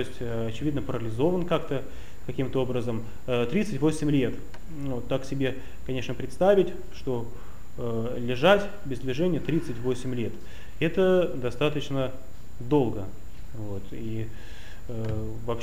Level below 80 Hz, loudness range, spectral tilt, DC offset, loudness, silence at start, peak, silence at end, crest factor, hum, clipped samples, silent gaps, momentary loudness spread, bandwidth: -46 dBFS; 4 LU; -7 dB/octave; 3%; -28 LUFS; 0 s; -6 dBFS; 0 s; 20 dB; none; under 0.1%; none; 19 LU; 15.5 kHz